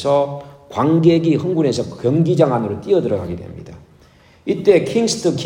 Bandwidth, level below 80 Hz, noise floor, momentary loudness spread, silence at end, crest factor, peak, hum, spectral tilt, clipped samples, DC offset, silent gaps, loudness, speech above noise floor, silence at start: 11.5 kHz; -54 dBFS; -49 dBFS; 15 LU; 0 s; 16 dB; 0 dBFS; none; -6.5 dB/octave; under 0.1%; under 0.1%; none; -17 LUFS; 33 dB; 0 s